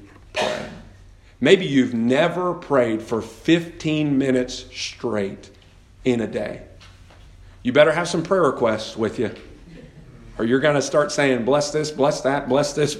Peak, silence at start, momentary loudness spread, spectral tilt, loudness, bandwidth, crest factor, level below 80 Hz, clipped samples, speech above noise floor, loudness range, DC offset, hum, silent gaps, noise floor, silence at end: 0 dBFS; 0 s; 12 LU; -5 dB/octave; -21 LUFS; 13 kHz; 22 dB; -50 dBFS; under 0.1%; 28 dB; 4 LU; under 0.1%; none; none; -48 dBFS; 0 s